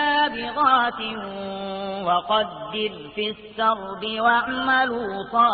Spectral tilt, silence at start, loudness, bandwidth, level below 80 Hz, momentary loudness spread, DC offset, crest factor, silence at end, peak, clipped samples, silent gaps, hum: -8.5 dB/octave; 0 s; -23 LUFS; 4.8 kHz; -58 dBFS; 10 LU; under 0.1%; 16 dB; 0 s; -6 dBFS; under 0.1%; none; none